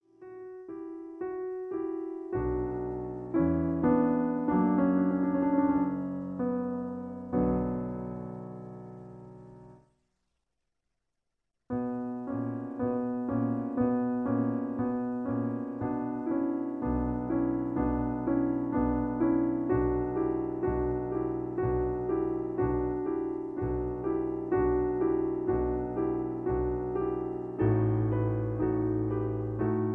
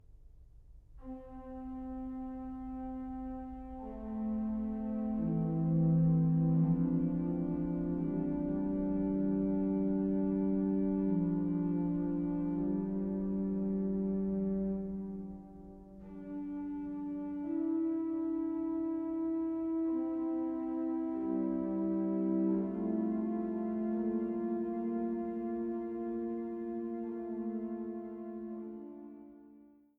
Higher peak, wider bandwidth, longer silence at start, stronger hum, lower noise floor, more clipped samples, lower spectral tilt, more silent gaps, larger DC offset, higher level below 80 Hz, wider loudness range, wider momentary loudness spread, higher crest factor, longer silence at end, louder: first, -14 dBFS vs -20 dBFS; first, 3.2 kHz vs 2.8 kHz; about the same, 0.2 s vs 0.1 s; neither; first, -85 dBFS vs -60 dBFS; neither; about the same, -12 dB/octave vs -13 dB/octave; neither; neither; first, -46 dBFS vs -56 dBFS; about the same, 8 LU vs 9 LU; about the same, 10 LU vs 12 LU; about the same, 16 dB vs 14 dB; second, 0 s vs 0.3 s; first, -31 LUFS vs -35 LUFS